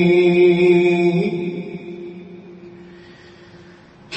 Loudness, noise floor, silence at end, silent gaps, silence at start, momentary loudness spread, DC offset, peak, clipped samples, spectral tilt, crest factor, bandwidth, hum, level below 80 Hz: -15 LUFS; -44 dBFS; 0 s; none; 0 s; 24 LU; under 0.1%; -4 dBFS; under 0.1%; -8 dB/octave; 14 dB; 8.2 kHz; none; -60 dBFS